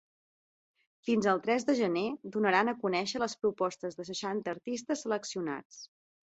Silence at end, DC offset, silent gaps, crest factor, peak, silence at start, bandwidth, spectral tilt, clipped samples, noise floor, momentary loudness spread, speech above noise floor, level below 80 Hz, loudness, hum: 0.55 s; under 0.1%; 5.65-5.70 s; 22 dB; -12 dBFS; 1.05 s; 8.2 kHz; -4.5 dB/octave; under 0.1%; under -90 dBFS; 10 LU; over 58 dB; -74 dBFS; -32 LUFS; none